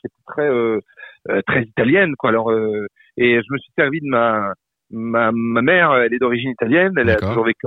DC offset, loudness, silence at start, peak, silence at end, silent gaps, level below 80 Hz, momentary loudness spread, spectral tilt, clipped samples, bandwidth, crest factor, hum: under 0.1%; -17 LUFS; 0.05 s; -2 dBFS; 0 s; none; -48 dBFS; 12 LU; -9 dB/octave; under 0.1%; 5 kHz; 16 dB; none